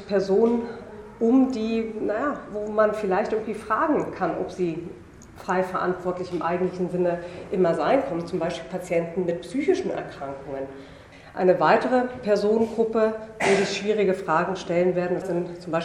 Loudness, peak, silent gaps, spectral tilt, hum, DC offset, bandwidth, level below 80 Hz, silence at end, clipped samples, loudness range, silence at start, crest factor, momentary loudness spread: -24 LUFS; -6 dBFS; none; -6 dB/octave; none; under 0.1%; 12 kHz; -56 dBFS; 0 s; under 0.1%; 5 LU; 0 s; 18 dB; 13 LU